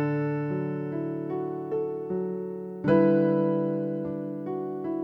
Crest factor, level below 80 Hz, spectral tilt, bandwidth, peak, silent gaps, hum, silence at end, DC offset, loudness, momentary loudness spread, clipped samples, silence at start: 18 dB; -66 dBFS; -11 dB/octave; 5.2 kHz; -8 dBFS; none; none; 0 s; under 0.1%; -28 LUFS; 11 LU; under 0.1%; 0 s